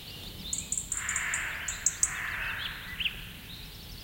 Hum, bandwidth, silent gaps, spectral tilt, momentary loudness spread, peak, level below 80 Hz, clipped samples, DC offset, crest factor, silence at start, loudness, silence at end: none; 17 kHz; none; 0 dB/octave; 14 LU; -8 dBFS; -50 dBFS; under 0.1%; under 0.1%; 26 dB; 0 s; -31 LUFS; 0 s